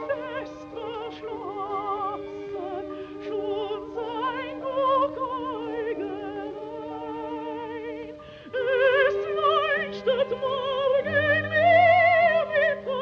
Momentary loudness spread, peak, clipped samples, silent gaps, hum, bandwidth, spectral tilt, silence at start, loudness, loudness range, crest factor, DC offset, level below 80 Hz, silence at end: 16 LU; -8 dBFS; under 0.1%; none; none; 6.8 kHz; -6 dB/octave; 0 s; -25 LUFS; 11 LU; 18 dB; under 0.1%; -60 dBFS; 0 s